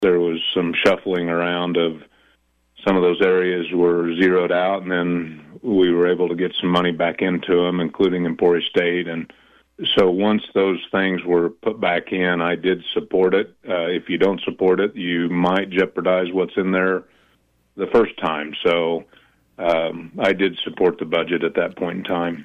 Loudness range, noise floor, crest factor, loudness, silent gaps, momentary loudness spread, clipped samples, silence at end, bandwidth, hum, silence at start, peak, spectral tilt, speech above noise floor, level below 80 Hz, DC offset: 2 LU; -62 dBFS; 14 dB; -20 LUFS; none; 7 LU; under 0.1%; 0 s; 7.4 kHz; none; 0 s; -6 dBFS; -7 dB/octave; 42 dB; -58 dBFS; under 0.1%